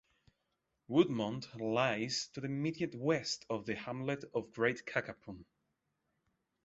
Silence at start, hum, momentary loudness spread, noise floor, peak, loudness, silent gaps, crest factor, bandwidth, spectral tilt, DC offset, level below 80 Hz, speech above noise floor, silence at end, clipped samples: 0.9 s; none; 9 LU; -84 dBFS; -16 dBFS; -36 LUFS; none; 22 dB; 8 kHz; -4.5 dB/octave; under 0.1%; -72 dBFS; 48 dB; 1.25 s; under 0.1%